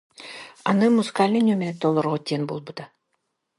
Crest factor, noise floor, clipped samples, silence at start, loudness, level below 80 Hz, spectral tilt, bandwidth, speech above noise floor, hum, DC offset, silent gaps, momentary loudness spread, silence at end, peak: 18 dB; -75 dBFS; under 0.1%; 0.2 s; -22 LUFS; -70 dBFS; -6.5 dB/octave; 11.5 kHz; 54 dB; none; under 0.1%; none; 19 LU; 0.7 s; -4 dBFS